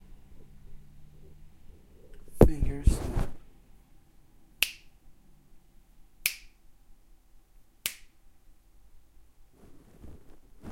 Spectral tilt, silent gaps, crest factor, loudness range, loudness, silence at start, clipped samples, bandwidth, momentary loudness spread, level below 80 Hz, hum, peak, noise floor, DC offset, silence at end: -5 dB/octave; none; 30 dB; 14 LU; -29 LUFS; 0.1 s; under 0.1%; 16.5 kHz; 29 LU; -38 dBFS; none; -4 dBFS; -56 dBFS; under 0.1%; 0 s